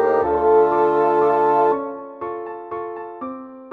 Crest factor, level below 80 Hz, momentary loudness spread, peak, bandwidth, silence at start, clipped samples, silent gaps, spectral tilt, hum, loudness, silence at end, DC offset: 14 dB; -52 dBFS; 16 LU; -6 dBFS; 4.6 kHz; 0 s; under 0.1%; none; -8 dB/octave; none; -18 LUFS; 0 s; under 0.1%